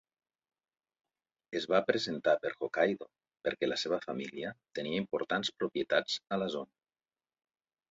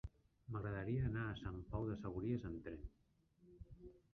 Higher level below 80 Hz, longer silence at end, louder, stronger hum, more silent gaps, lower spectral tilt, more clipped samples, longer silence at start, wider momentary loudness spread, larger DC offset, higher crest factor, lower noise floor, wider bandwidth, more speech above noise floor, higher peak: second, -76 dBFS vs -58 dBFS; first, 1.25 s vs 0.15 s; first, -34 LUFS vs -45 LUFS; neither; neither; second, -2.5 dB/octave vs -7.5 dB/octave; neither; first, 1.5 s vs 0.05 s; second, 10 LU vs 20 LU; neither; about the same, 22 dB vs 18 dB; first, under -90 dBFS vs -72 dBFS; first, 7.6 kHz vs 6.4 kHz; first, over 57 dB vs 28 dB; first, -14 dBFS vs -28 dBFS